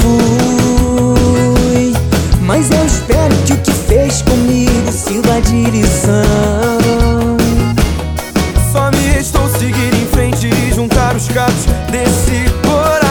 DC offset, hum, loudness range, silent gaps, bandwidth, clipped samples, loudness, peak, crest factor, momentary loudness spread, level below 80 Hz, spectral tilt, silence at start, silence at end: under 0.1%; none; 2 LU; none; over 20 kHz; under 0.1%; -12 LUFS; 0 dBFS; 10 dB; 3 LU; -18 dBFS; -5.5 dB/octave; 0 s; 0 s